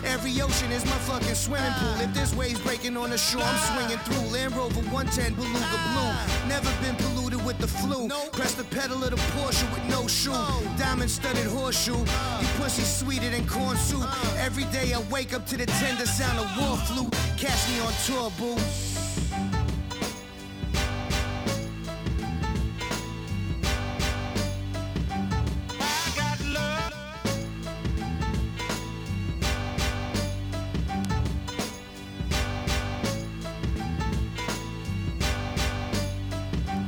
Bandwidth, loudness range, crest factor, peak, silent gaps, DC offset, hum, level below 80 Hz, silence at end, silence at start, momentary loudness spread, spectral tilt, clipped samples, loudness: over 20 kHz; 4 LU; 16 dB; -12 dBFS; none; under 0.1%; none; -36 dBFS; 0 s; 0 s; 7 LU; -4 dB/octave; under 0.1%; -28 LUFS